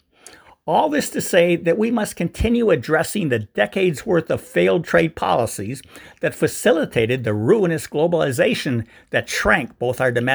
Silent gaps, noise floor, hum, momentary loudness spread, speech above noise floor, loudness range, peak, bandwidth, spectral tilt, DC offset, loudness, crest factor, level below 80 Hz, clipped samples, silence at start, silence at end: none; -47 dBFS; none; 7 LU; 28 dB; 1 LU; 0 dBFS; over 20 kHz; -5 dB/octave; under 0.1%; -19 LUFS; 18 dB; -40 dBFS; under 0.1%; 0.25 s; 0 s